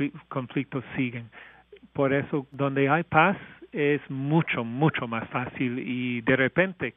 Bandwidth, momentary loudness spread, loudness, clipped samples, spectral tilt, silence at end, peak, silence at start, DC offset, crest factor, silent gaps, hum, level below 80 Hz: 3.9 kHz; 11 LU; -26 LUFS; under 0.1%; -5.5 dB/octave; 0.05 s; -4 dBFS; 0 s; under 0.1%; 22 dB; none; none; -64 dBFS